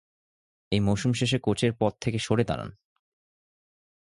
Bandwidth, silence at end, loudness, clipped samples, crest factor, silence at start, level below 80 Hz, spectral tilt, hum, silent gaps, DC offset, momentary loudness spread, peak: 11.5 kHz; 1.5 s; -27 LUFS; under 0.1%; 20 dB; 0.7 s; -52 dBFS; -6 dB/octave; none; none; under 0.1%; 5 LU; -8 dBFS